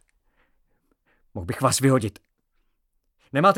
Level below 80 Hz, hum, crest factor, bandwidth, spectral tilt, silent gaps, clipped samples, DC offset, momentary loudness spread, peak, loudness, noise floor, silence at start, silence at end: -56 dBFS; none; 22 dB; 18 kHz; -5 dB/octave; none; under 0.1%; under 0.1%; 16 LU; -4 dBFS; -23 LUFS; -71 dBFS; 1.35 s; 0 s